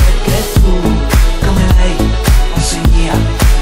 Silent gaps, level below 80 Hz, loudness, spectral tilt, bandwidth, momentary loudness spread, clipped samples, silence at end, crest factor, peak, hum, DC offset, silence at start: none; -10 dBFS; -12 LUFS; -5 dB/octave; 16 kHz; 2 LU; under 0.1%; 0 s; 8 dB; 0 dBFS; none; under 0.1%; 0 s